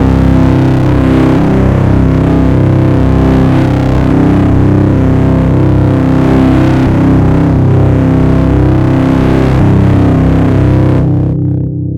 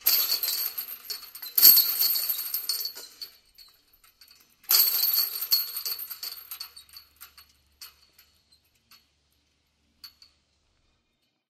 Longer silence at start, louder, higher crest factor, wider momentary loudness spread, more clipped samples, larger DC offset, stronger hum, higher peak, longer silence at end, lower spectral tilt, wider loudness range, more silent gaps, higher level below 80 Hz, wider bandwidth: about the same, 0 s vs 0.05 s; first, -8 LUFS vs -22 LUFS; second, 6 dB vs 28 dB; second, 1 LU vs 24 LU; neither; neither; neither; about the same, 0 dBFS vs 0 dBFS; second, 0 s vs 1.4 s; first, -9.5 dB/octave vs 3 dB/octave; second, 0 LU vs 16 LU; neither; first, -16 dBFS vs -72 dBFS; second, 7.8 kHz vs 16 kHz